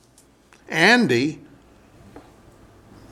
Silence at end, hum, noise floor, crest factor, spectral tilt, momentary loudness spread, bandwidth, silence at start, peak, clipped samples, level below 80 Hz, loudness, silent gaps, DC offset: 0.95 s; none; -55 dBFS; 22 dB; -4.5 dB/octave; 14 LU; 14 kHz; 0.7 s; -2 dBFS; under 0.1%; -58 dBFS; -18 LUFS; none; under 0.1%